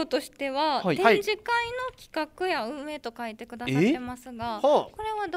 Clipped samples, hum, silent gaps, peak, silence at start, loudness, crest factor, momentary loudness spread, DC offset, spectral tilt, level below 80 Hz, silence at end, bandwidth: under 0.1%; none; none; -4 dBFS; 0 s; -27 LUFS; 22 dB; 13 LU; under 0.1%; -5.5 dB/octave; -60 dBFS; 0 s; 16 kHz